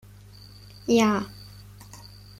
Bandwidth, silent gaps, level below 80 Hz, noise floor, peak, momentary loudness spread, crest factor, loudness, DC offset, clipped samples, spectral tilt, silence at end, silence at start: 16 kHz; none; -54 dBFS; -47 dBFS; -10 dBFS; 26 LU; 18 dB; -24 LUFS; under 0.1%; under 0.1%; -5 dB/octave; 0.45 s; 0.85 s